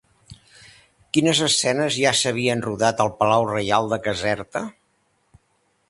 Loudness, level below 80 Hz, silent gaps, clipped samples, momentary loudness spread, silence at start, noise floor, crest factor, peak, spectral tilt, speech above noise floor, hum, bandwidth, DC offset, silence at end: -20 LUFS; -56 dBFS; none; under 0.1%; 7 LU; 0.3 s; -67 dBFS; 20 dB; -2 dBFS; -3.5 dB/octave; 46 dB; none; 11.5 kHz; under 0.1%; 1.2 s